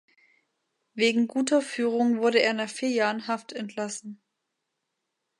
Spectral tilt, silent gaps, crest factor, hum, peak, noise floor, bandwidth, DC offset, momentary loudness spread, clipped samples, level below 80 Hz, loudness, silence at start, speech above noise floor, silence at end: -3.5 dB/octave; none; 22 dB; none; -6 dBFS; -82 dBFS; 11.5 kHz; under 0.1%; 13 LU; under 0.1%; -82 dBFS; -26 LUFS; 0.95 s; 56 dB; 1.25 s